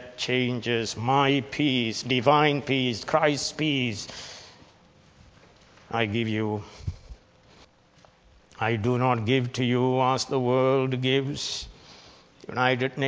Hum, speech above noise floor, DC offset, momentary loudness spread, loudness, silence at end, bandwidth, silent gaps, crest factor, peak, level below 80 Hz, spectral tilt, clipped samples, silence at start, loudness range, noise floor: none; 33 dB; under 0.1%; 13 LU; -25 LUFS; 0 s; 8 kHz; none; 20 dB; -6 dBFS; -54 dBFS; -5 dB/octave; under 0.1%; 0 s; 9 LU; -58 dBFS